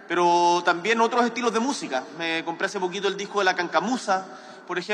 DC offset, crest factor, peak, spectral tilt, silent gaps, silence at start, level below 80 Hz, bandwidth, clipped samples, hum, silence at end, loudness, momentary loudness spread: under 0.1%; 18 dB; -8 dBFS; -3.5 dB/octave; none; 0 s; -78 dBFS; 11 kHz; under 0.1%; none; 0 s; -24 LUFS; 9 LU